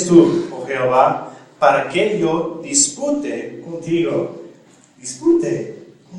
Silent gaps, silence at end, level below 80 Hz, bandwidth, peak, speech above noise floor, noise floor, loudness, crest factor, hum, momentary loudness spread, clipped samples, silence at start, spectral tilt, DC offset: none; 0 s; -60 dBFS; 11 kHz; 0 dBFS; 32 dB; -48 dBFS; -17 LUFS; 18 dB; none; 15 LU; under 0.1%; 0 s; -4 dB/octave; under 0.1%